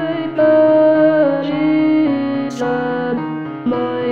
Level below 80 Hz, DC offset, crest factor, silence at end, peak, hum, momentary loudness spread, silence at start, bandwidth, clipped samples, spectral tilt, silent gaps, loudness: -62 dBFS; 0.4%; 12 dB; 0 s; -2 dBFS; none; 10 LU; 0 s; 7.2 kHz; under 0.1%; -7.5 dB/octave; none; -15 LUFS